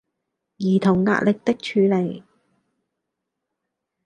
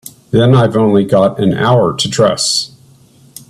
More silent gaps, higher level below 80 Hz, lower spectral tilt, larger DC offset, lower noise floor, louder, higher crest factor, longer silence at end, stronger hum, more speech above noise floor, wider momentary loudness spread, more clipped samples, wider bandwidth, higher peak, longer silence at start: neither; second, -60 dBFS vs -46 dBFS; first, -7.5 dB/octave vs -5.5 dB/octave; neither; first, -81 dBFS vs -44 dBFS; second, -20 LUFS vs -11 LUFS; first, 20 dB vs 12 dB; first, 1.85 s vs 0.85 s; neither; first, 62 dB vs 34 dB; first, 10 LU vs 5 LU; neither; second, 9 kHz vs 13.5 kHz; second, -4 dBFS vs 0 dBFS; first, 0.6 s vs 0.05 s